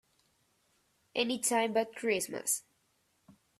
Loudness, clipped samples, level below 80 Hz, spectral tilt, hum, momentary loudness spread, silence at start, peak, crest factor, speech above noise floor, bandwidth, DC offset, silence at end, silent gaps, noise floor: -32 LUFS; under 0.1%; -80 dBFS; -2 dB/octave; none; 5 LU; 1.15 s; -16 dBFS; 20 dB; 42 dB; 15.5 kHz; under 0.1%; 1 s; none; -75 dBFS